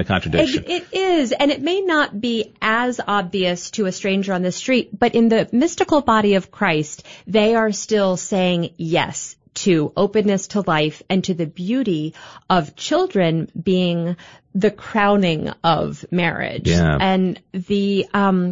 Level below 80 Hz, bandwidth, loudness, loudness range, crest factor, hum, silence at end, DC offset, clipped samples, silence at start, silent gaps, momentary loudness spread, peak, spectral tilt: -44 dBFS; 7.8 kHz; -19 LUFS; 3 LU; 16 dB; none; 0 s; 0.2%; under 0.1%; 0 s; none; 7 LU; -4 dBFS; -5.5 dB/octave